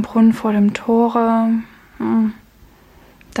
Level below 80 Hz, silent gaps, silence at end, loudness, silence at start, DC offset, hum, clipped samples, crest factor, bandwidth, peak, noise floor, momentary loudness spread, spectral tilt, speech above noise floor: -52 dBFS; none; 0 s; -17 LUFS; 0 s; under 0.1%; none; under 0.1%; 14 dB; 9 kHz; -4 dBFS; -48 dBFS; 8 LU; -7.5 dB/octave; 32 dB